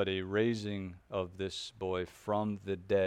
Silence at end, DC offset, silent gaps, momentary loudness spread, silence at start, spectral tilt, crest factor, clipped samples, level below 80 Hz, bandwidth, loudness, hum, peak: 0 s; under 0.1%; none; 8 LU; 0 s; -6 dB/octave; 16 dB; under 0.1%; -64 dBFS; 14.5 kHz; -36 LUFS; none; -18 dBFS